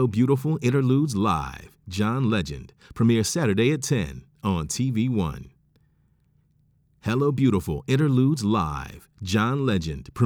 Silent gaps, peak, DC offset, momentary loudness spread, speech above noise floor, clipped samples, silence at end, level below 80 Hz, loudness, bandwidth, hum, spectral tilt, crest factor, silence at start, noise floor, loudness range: none; -8 dBFS; under 0.1%; 13 LU; 41 dB; under 0.1%; 0 s; -46 dBFS; -24 LUFS; 17 kHz; none; -6 dB/octave; 16 dB; 0 s; -64 dBFS; 4 LU